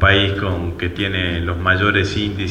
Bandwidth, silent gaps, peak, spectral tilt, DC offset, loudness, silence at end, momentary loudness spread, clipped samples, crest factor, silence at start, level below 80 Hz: 8.4 kHz; none; 0 dBFS; -6 dB/octave; under 0.1%; -18 LUFS; 0 s; 7 LU; under 0.1%; 18 dB; 0 s; -32 dBFS